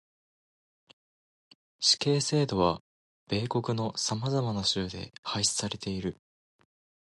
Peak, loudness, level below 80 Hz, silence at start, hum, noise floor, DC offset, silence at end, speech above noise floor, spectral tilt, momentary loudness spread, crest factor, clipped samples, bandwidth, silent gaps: -10 dBFS; -29 LUFS; -56 dBFS; 1.8 s; none; under -90 dBFS; under 0.1%; 1 s; over 61 dB; -4 dB/octave; 11 LU; 22 dB; under 0.1%; 11.5 kHz; 2.80-3.26 s, 5.18-5.23 s